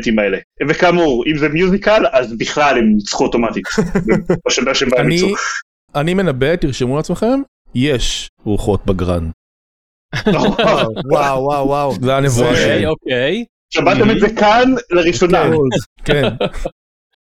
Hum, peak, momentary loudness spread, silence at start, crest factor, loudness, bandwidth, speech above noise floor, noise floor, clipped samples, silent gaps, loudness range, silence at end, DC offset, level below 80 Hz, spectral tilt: none; 0 dBFS; 8 LU; 0 s; 14 dB; -15 LUFS; 15 kHz; over 76 dB; under -90 dBFS; under 0.1%; 0.44-0.50 s, 5.62-5.88 s, 7.48-7.65 s, 8.29-8.37 s, 9.34-10.09 s, 13.49-13.69 s, 15.86-15.96 s; 4 LU; 0.65 s; under 0.1%; -32 dBFS; -5 dB/octave